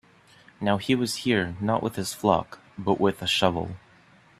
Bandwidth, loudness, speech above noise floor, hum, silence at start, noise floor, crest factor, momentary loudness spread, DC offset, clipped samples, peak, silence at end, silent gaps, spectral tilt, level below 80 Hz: 14.5 kHz; -25 LUFS; 31 dB; none; 0.6 s; -56 dBFS; 22 dB; 10 LU; under 0.1%; under 0.1%; -4 dBFS; 0.65 s; none; -5 dB/octave; -58 dBFS